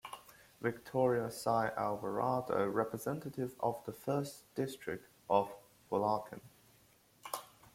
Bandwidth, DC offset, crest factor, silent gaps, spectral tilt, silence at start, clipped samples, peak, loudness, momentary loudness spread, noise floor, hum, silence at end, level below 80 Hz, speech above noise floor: 16.5 kHz; under 0.1%; 22 dB; none; -6 dB/octave; 0.05 s; under 0.1%; -16 dBFS; -37 LUFS; 12 LU; -67 dBFS; none; 0.3 s; -72 dBFS; 31 dB